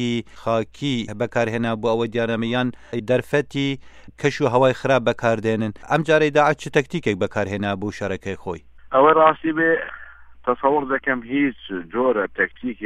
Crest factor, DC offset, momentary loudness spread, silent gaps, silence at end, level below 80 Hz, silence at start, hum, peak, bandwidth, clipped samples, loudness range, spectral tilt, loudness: 20 dB; under 0.1%; 10 LU; none; 0 s; -52 dBFS; 0 s; none; -2 dBFS; 11.5 kHz; under 0.1%; 3 LU; -6 dB/octave; -21 LUFS